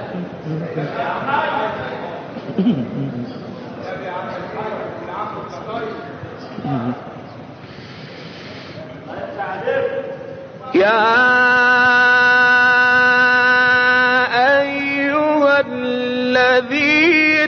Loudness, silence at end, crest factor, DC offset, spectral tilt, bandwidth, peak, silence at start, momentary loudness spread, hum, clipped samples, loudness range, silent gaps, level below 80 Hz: -15 LUFS; 0 s; 14 dB; under 0.1%; -2 dB/octave; 6.6 kHz; -4 dBFS; 0 s; 22 LU; none; under 0.1%; 16 LU; none; -58 dBFS